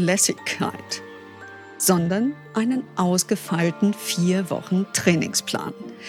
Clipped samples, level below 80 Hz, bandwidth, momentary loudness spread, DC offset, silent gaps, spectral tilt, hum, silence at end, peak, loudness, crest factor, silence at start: under 0.1%; -66 dBFS; 19 kHz; 13 LU; under 0.1%; none; -4 dB/octave; none; 0 s; -4 dBFS; -22 LUFS; 18 dB; 0 s